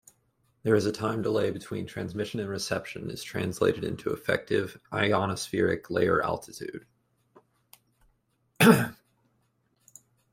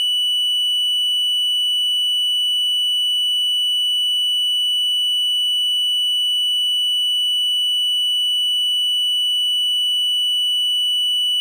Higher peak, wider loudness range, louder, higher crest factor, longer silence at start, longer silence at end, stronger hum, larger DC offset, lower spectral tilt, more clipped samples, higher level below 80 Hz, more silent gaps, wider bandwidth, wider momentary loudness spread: first, -4 dBFS vs -14 dBFS; first, 3 LU vs 0 LU; second, -28 LUFS vs -15 LUFS; first, 24 dB vs 4 dB; first, 0.65 s vs 0 s; first, 1.4 s vs 0 s; second, none vs 50 Hz at -100 dBFS; neither; first, -5.5 dB/octave vs 11 dB/octave; neither; first, -62 dBFS vs under -90 dBFS; neither; about the same, 16 kHz vs 15.5 kHz; first, 13 LU vs 0 LU